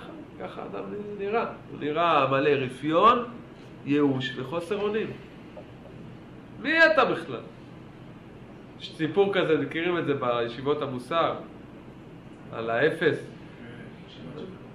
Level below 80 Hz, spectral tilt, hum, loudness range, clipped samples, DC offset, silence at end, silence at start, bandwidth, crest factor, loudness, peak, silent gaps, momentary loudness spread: -60 dBFS; -6.5 dB/octave; none; 5 LU; under 0.1%; under 0.1%; 0 s; 0 s; 11.5 kHz; 22 dB; -25 LUFS; -6 dBFS; none; 25 LU